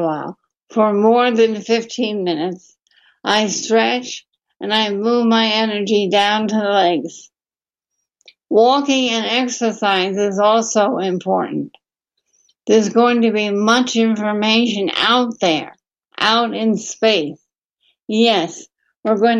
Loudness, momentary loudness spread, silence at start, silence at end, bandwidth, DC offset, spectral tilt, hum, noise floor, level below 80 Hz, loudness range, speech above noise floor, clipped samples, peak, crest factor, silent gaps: -16 LUFS; 12 LU; 0 s; 0 s; 9.2 kHz; under 0.1%; -3.5 dB/octave; none; under -90 dBFS; -70 dBFS; 3 LU; over 74 dB; under 0.1%; -2 dBFS; 16 dB; 17.58-17.76 s